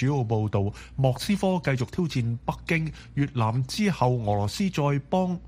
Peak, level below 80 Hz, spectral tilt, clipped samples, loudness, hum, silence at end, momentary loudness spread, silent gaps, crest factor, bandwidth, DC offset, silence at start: -8 dBFS; -48 dBFS; -6.5 dB/octave; under 0.1%; -26 LUFS; none; 0 s; 5 LU; none; 18 dB; 15.5 kHz; under 0.1%; 0 s